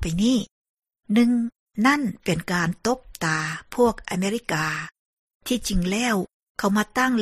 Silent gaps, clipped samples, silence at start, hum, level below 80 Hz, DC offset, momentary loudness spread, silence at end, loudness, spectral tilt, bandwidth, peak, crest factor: 0.51-0.75 s, 1.59-1.66 s, 4.99-5.27 s, 5.35-5.40 s, 6.34-6.55 s; under 0.1%; 0 s; none; -42 dBFS; under 0.1%; 8 LU; 0 s; -24 LUFS; -5 dB/octave; 15 kHz; -6 dBFS; 18 dB